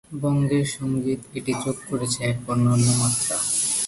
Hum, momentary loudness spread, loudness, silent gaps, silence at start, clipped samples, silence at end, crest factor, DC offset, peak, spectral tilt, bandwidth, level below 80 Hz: none; 8 LU; -23 LUFS; none; 0.1 s; under 0.1%; 0 s; 16 dB; under 0.1%; -8 dBFS; -4.5 dB/octave; 12 kHz; -52 dBFS